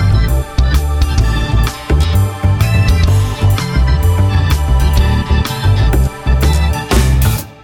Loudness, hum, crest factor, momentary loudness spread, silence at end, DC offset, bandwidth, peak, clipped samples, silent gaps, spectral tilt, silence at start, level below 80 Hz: -13 LUFS; none; 10 dB; 3 LU; 0.1 s; under 0.1%; 17.5 kHz; 0 dBFS; under 0.1%; none; -6 dB/octave; 0 s; -14 dBFS